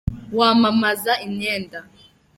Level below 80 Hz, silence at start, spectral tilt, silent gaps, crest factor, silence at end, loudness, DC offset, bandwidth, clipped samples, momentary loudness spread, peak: -42 dBFS; 0.05 s; -5 dB/octave; none; 18 dB; 0.55 s; -19 LUFS; under 0.1%; 16.5 kHz; under 0.1%; 14 LU; -2 dBFS